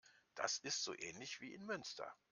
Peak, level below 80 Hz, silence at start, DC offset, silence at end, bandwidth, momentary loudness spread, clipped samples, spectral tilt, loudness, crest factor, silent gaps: -24 dBFS; -86 dBFS; 0.05 s; under 0.1%; 0.15 s; 11.5 kHz; 10 LU; under 0.1%; -1 dB/octave; -45 LUFS; 24 dB; none